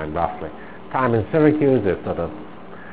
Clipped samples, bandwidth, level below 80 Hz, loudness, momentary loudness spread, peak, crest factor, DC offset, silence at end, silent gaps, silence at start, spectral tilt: under 0.1%; 4 kHz; -44 dBFS; -20 LUFS; 22 LU; -2 dBFS; 18 dB; 1%; 0 s; none; 0 s; -12 dB/octave